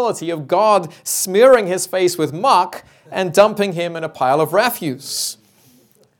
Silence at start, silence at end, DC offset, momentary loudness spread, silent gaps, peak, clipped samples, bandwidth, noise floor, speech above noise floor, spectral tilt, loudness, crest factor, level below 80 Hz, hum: 0 s; 0.85 s; under 0.1%; 12 LU; none; 0 dBFS; under 0.1%; 19 kHz; -53 dBFS; 37 dB; -3.5 dB/octave; -16 LUFS; 16 dB; -64 dBFS; none